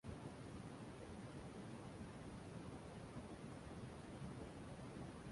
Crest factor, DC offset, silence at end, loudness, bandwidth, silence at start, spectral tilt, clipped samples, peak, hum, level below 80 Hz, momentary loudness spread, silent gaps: 14 dB; under 0.1%; 0 s; -54 LUFS; 11.5 kHz; 0.05 s; -6 dB/octave; under 0.1%; -40 dBFS; none; -64 dBFS; 1 LU; none